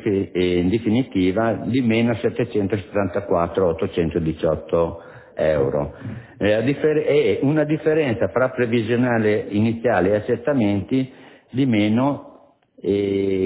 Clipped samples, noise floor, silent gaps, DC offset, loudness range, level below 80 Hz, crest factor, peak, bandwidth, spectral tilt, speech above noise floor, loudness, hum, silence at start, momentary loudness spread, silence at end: under 0.1%; -51 dBFS; none; under 0.1%; 3 LU; -44 dBFS; 16 dB; -4 dBFS; 4 kHz; -11.5 dB/octave; 31 dB; -20 LUFS; none; 0 s; 5 LU; 0 s